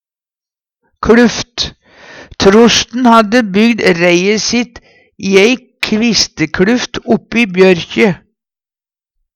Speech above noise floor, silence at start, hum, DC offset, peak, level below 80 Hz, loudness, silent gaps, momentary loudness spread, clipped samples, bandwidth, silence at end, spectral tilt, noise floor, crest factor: over 80 dB; 1 s; none; under 0.1%; 0 dBFS; -40 dBFS; -10 LUFS; none; 9 LU; 0.1%; 11.5 kHz; 1.2 s; -4 dB/octave; under -90 dBFS; 12 dB